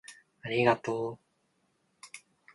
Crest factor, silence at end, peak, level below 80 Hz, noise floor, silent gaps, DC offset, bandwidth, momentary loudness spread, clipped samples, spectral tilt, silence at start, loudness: 24 dB; 0.35 s; -10 dBFS; -72 dBFS; -74 dBFS; none; under 0.1%; 11.5 kHz; 24 LU; under 0.1%; -5.5 dB/octave; 0.1 s; -30 LUFS